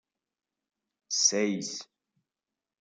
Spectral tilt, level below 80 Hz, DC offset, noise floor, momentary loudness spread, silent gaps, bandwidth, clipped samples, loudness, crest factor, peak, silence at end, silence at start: -1.5 dB/octave; -86 dBFS; under 0.1%; under -90 dBFS; 14 LU; none; 11 kHz; under 0.1%; -27 LUFS; 24 dB; -10 dBFS; 0.95 s; 1.1 s